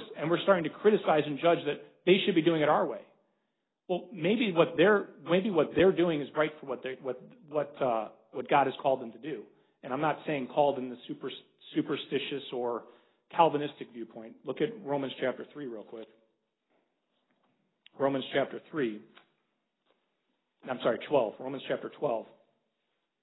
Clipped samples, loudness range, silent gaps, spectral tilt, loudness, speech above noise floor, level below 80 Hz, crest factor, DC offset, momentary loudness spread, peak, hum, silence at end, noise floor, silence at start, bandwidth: under 0.1%; 9 LU; none; -9.5 dB/octave; -30 LUFS; 52 dB; -72 dBFS; 22 dB; under 0.1%; 16 LU; -8 dBFS; none; 1 s; -82 dBFS; 0 s; 4.1 kHz